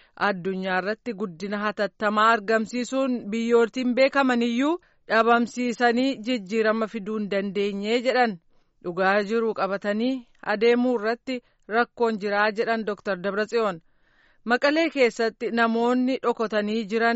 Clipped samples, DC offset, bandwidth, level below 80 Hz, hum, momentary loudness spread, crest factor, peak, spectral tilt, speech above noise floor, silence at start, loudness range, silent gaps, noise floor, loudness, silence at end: under 0.1%; under 0.1%; 8 kHz; -66 dBFS; none; 9 LU; 16 dB; -8 dBFS; -3 dB/octave; 37 dB; 0.2 s; 3 LU; none; -61 dBFS; -24 LUFS; 0 s